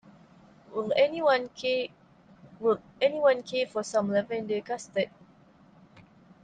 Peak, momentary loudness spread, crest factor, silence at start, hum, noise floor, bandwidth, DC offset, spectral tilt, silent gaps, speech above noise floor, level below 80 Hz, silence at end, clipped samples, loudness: -12 dBFS; 9 LU; 18 dB; 0.7 s; none; -58 dBFS; 9.4 kHz; under 0.1%; -4.5 dB/octave; none; 30 dB; -72 dBFS; 0.45 s; under 0.1%; -28 LUFS